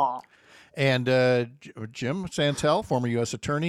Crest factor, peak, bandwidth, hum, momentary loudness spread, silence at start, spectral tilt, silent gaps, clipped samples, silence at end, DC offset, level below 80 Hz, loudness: 16 dB; -10 dBFS; 13 kHz; none; 17 LU; 0 s; -5.5 dB/octave; none; under 0.1%; 0 s; under 0.1%; -58 dBFS; -25 LUFS